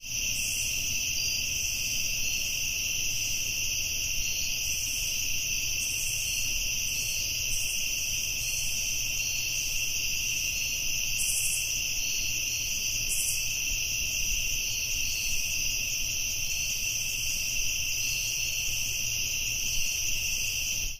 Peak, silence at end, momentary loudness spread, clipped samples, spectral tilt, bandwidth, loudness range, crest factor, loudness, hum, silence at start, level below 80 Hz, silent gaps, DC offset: -14 dBFS; 0 s; 1 LU; under 0.1%; 1 dB/octave; 16 kHz; 1 LU; 16 dB; -27 LUFS; none; 0 s; -42 dBFS; none; under 0.1%